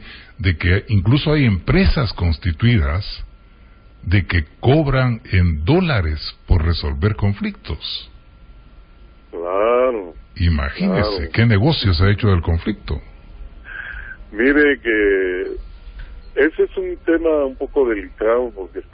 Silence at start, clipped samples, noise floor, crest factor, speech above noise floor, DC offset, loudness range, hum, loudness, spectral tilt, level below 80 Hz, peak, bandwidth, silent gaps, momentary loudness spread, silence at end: 0 s; under 0.1%; -45 dBFS; 16 dB; 28 dB; under 0.1%; 5 LU; none; -18 LUFS; -12 dB/octave; -26 dBFS; -2 dBFS; 5.4 kHz; none; 14 LU; 0.1 s